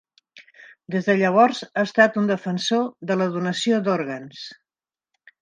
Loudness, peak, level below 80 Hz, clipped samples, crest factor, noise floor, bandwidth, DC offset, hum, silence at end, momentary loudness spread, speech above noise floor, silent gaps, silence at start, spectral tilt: -21 LUFS; -2 dBFS; -74 dBFS; under 0.1%; 22 dB; under -90 dBFS; 9.8 kHz; under 0.1%; none; 0.9 s; 14 LU; over 69 dB; none; 0.4 s; -5.5 dB/octave